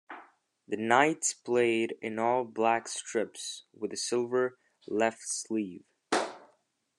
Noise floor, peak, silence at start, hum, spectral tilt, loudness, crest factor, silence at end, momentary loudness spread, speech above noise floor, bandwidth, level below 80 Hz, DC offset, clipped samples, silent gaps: -71 dBFS; -8 dBFS; 0.1 s; none; -3 dB/octave; -30 LUFS; 24 dB; 0.55 s; 13 LU; 41 dB; 12.5 kHz; -80 dBFS; under 0.1%; under 0.1%; none